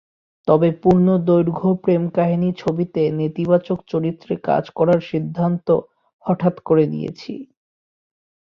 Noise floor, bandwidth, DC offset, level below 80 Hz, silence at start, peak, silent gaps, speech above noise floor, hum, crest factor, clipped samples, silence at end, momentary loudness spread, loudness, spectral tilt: under -90 dBFS; 6.4 kHz; under 0.1%; -56 dBFS; 0.45 s; -2 dBFS; 6.13-6.19 s; over 72 dB; none; 18 dB; under 0.1%; 1.1 s; 10 LU; -19 LUFS; -10 dB/octave